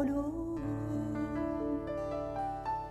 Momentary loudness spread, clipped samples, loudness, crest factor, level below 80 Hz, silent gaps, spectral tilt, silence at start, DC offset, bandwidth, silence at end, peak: 2 LU; under 0.1%; -36 LUFS; 12 dB; -50 dBFS; none; -8.5 dB/octave; 0 s; under 0.1%; 12 kHz; 0 s; -22 dBFS